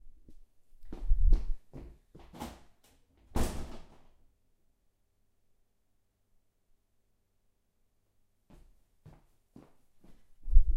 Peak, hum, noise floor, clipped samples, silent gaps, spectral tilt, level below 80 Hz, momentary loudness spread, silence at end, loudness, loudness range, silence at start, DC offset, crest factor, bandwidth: -8 dBFS; none; -74 dBFS; under 0.1%; none; -6 dB/octave; -34 dBFS; 28 LU; 0 s; -37 LUFS; 8 LU; 0.05 s; under 0.1%; 24 dB; 11 kHz